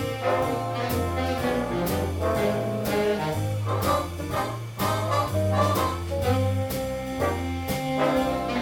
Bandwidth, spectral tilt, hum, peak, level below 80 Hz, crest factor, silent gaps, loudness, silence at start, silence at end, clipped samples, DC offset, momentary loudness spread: 18 kHz; -6 dB/octave; none; -10 dBFS; -42 dBFS; 16 dB; none; -26 LUFS; 0 s; 0 s; under 0.1%; under 0.1%; 5 LU